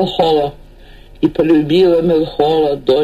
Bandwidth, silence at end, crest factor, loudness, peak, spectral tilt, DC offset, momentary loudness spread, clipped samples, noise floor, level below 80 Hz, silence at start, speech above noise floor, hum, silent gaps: 13 kHz; 0 s; 10 dB; -13 LUFS; -2 dBFS; -7.5 dB/octave; under 0.1%; 6 LU; under 0.1%; -38 dBFS; -38 dBFS; 0 s; 26 dB; none; none